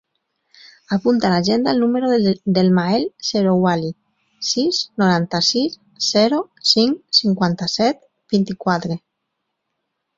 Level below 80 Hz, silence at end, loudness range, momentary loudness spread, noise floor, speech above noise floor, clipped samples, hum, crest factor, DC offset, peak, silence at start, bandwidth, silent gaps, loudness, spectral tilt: -58 dBFS; 1.2 s; 2 LU; 7 LU; -76 dBFS; 58 dB; under 0.1%; none; 18 dB; under 0.1%; -2 dBFS; 0.9 s; 7.6 kHz; none; -18 LUFS; -5 dB/octave